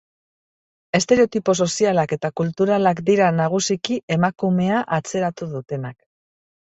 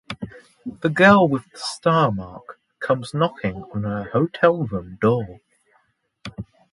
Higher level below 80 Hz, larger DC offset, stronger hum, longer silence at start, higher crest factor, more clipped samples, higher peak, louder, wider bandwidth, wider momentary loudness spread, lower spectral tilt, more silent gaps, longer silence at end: second, -60 dBFS vs -52 dBFS; neither; neither; first, 0.95 s vs 0.1 s; about the same, 18 dB vs 20 dB; neither; about the same, -2 dBFS vs -2 dBFS; about the same, -20 LUFS vs -20 LUFS; second, 8.2 kHz vs 11.5 kHz; second, 10 LU vs 22 LU; second, -5 dB/octave vs -6.5 dB/octave; first, 4.03-4.08 s vs none; first, 0.85 s vs 0.3 s